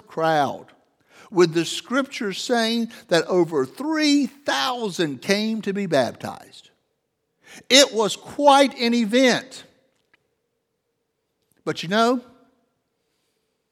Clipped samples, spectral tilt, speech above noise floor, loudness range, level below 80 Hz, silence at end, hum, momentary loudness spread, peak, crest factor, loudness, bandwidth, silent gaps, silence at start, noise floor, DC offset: under 0.1%; -3.5 dB/octave; 54 dB; 9 LU; -74 dBFS; 1.5 s; none; 12 LU; 0 dBFS; 22 dB; -21 LUFS; 16 kHz; none; 0.1 s; -75 dBFS; under 0.1%